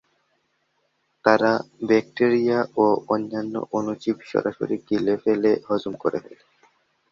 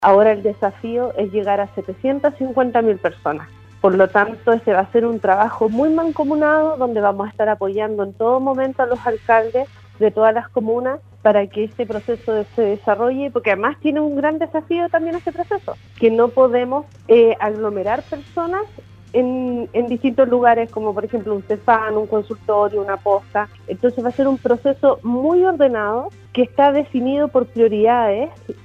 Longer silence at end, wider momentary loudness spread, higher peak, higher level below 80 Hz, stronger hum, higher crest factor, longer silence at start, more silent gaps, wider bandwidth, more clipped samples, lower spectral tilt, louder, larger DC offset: first, 0.8 s vs 0.1 s; about the same, 8 LU vs 9 LU; about the same, -2 dBFS vs 0 dBFS; second, -66 dBFS vs -54 dBFS; neither; first, 22 dB vs 16 dB; first, 1.25 s vs 0 s; neither; first, 7.4 kHz vs 6.6 kHz; neither; about the same, -7 dB/octave vs -8 dB/octave; second, -23 LUFS vs -18 LUFS; neither